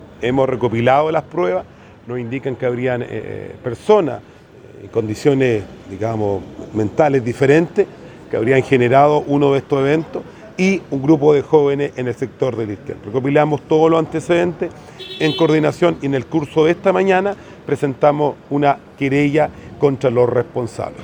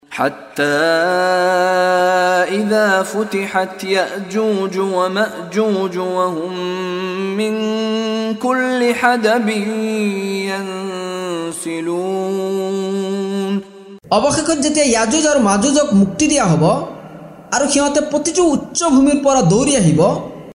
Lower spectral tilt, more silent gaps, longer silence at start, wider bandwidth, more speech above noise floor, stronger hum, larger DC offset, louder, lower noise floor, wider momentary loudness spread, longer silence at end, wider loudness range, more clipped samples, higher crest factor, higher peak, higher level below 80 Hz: first, -7 dB/octave vs -4.5 dB/octave; neither; about the same, 0 s vs 0.1 s; second, 10.5 kHz vs 15.5 kHz; about the same, 24 dB vs 22 dB; neither; neither; about the same, -17 LUFS vs -16 LUFS; about the same, -40 dBFS vs -37 dBFS; first, 12 LU vs 9 LU; about the same, 0 s vs 0 s; about the same, 5 LU vs 6 LU; neither; about the same, 16 dB vs 16 dB; about the same, 0 dBFS vs 0 dBFS; about the same, -52 dBFS vs -48 dBFS